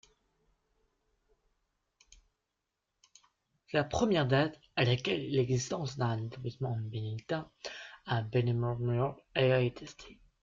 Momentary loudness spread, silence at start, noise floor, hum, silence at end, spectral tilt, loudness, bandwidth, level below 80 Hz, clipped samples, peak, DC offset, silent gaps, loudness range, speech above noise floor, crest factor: 14 LU; 3.7 s; -86 dBFS; none; 0.3 s; -6 dB/octave; -32 LUFS; 7.6 kHz; -62 dBFS; under 0.1%; -14 dBFS; under 0.1%; none; 4 LU; 54 dB; 20 dB